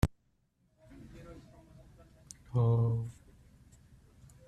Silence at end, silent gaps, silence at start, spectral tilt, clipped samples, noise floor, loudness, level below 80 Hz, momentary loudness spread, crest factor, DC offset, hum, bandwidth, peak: 1.35 s; none; 0.05 s; -8 dB/octave; under 0.1%; -74 dBFS; -32 LUFS; -50 dBFS; 25 LU; 26 dB; under 0.1%; none; 11.5 kHz; -10 dBFS